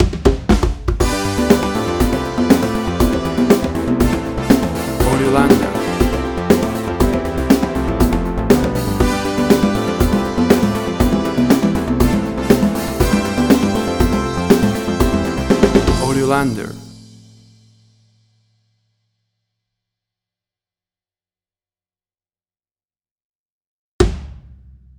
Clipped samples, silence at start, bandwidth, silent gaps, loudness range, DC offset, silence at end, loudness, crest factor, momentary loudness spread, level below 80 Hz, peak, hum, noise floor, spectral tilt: under 0.1%; 0 s; over 20 kHz; 22.71-22.75 s, 23.11-23.16 s, 23.23-23.99 s; 5 LU; under 0.1%; 0.45 s; -16 LUFS; 16 dB; 5 LU; -26 dBFS; 0 dBFS; none; under -90 dBFS; -6 dB/octave